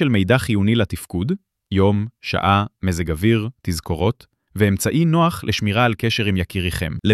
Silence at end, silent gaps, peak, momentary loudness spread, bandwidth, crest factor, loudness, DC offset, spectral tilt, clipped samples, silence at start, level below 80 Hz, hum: 0 s; none; -2 dBFS; 8 LU; 14.5 kHz; 16 dB; -20 LUFS; under 0.1%; -6 dB/octave; under 0.1%; 0 s; -40 dBFS; none